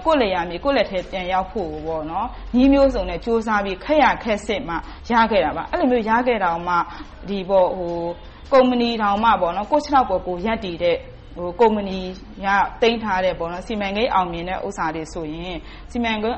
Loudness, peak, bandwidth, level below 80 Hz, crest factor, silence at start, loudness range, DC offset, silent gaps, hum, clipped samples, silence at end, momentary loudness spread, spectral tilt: -20 LUFS; -6 dBFS; 8.4 kHz; -38 dBFS; 16 dB; 0 s; 3 LU; under 0.1%; none; none; under 0.1%; 0 s; 12 LU; -6 dB/octave